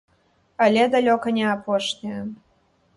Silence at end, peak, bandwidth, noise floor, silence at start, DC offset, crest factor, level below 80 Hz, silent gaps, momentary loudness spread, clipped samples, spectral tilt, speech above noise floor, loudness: 0.6 s; -6 dBFS; 11.5 kHz; -63 dBFS; 0.6 s; under 0.1%; 18 dB; -64 dBFS; none; 15 LU; under 0.1%; -5 dB/octave; 42 dB; -21 LUFS